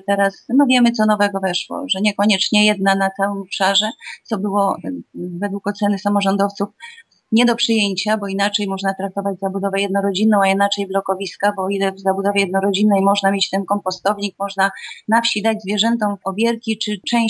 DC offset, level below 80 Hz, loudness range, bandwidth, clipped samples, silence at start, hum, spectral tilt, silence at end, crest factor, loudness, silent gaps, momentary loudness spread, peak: under 0.1%; -70 dBFS; 3 LU; 11 kHz; under 0.1%; 0.1 s; none; -4.5 dB/octave; 0 s; 16 dB; -18 LUFS; none; 8 LU; -2 dBFS